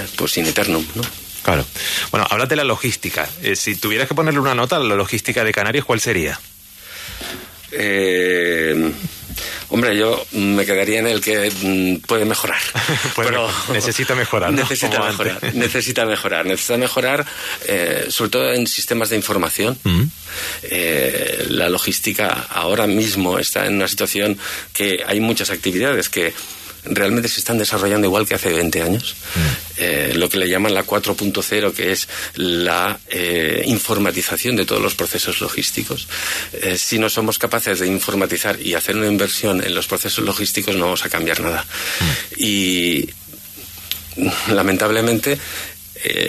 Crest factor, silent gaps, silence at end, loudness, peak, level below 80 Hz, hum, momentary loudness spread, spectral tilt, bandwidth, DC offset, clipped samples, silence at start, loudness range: 18 dB; none; 0 s; -18 LUFS; 0 dBFS; -44 dBFS; none; 7 LU; -3.5 dB/octave; 14 kHz; under 0.1%; under 0.1%; 0 s; 2 LU